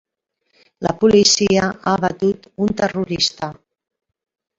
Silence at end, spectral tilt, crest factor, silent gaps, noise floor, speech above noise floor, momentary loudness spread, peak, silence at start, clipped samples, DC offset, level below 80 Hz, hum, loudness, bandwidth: 1.05 s; -3.5 dB/octave; 18 dB; none; -70 dBFS; 53 dB; 12 LU; -2 dBFS; 0.8 s; under 0.1%; under 0.1%; -50 dBFS; none; -17 LUFS; 7.8 kHz